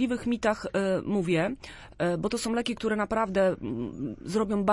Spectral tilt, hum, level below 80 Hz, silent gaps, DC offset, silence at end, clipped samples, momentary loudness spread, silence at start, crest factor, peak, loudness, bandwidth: -5.5 dB/octave; none; -52 dBFS; none; under 0.1%; 0 s; under 0.1%; 8 LU; 0 s; 16 dB; -10 dBFS; -28 LUFS; 11.5 kHz